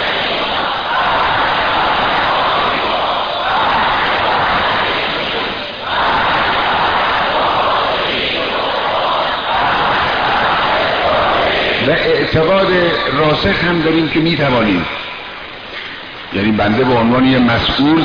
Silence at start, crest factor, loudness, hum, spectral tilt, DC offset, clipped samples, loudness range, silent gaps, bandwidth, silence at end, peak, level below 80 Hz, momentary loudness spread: 0 s; 12 dB; -13 LUFS; none; -6.5 dB/octave; 0.3%; under 0.1%; 2 LU; none; 5.4 kHz; 0 s; -2 dBFS; -36 dBFS; 6 LU